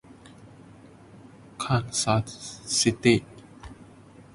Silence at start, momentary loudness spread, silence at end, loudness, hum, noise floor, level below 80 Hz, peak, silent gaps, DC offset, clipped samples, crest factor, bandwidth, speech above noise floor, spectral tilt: 0.45 s; 25 LU; 0.5 s; -25 LUFS; none; -50 dBFS; -54 dBFS; -6 dBFS; none; under 0.1%; under 0.1%; 22 dB; 11.5 kHz; 25 dB; -4 dB/octave